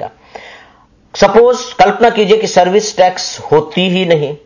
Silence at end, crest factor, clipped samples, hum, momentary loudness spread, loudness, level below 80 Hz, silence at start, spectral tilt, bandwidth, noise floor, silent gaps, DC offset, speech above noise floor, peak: 0.1 s; 12 dB; 0.2%; none; 5 LU; -11 LUFS; -46 dBFS; 0 s; -4.5 dB/octave; 7.4 kHz; -46 dBFS; none; under 0.1%; 36 dB; 0 dBFS